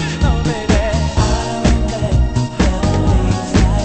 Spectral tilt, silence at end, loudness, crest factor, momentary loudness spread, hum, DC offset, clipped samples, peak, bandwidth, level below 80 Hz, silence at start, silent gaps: -6 dB/octave; 0 s; -16 LUFS; 14 dB; 2 LU; none; under 0.1%; under 0.1%; 0 dBFS; 8.8 kHz; -18 dBFS; 0 s; none